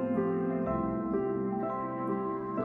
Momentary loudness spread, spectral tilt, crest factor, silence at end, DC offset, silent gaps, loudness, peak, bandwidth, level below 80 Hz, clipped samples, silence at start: 4 LU; -11.5 dB/octave; 14 dB; 0 s; under 0.1%; none; -32 LUFS; -18 dBFS; 3.5 kHz; -56 dBFS; under 0.1%; 0 s